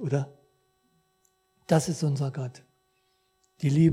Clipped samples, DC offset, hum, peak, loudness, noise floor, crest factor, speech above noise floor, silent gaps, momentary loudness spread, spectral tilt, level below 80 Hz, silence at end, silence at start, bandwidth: under 0.1%; under 0.1%; none; -8 dBFS; -28 LUFS; -71 dBFS; 20 dB; 46 dB; none; 15 LU; -7 dB/octave; -64 dBFS; 0 s; 0 s; 14 kHz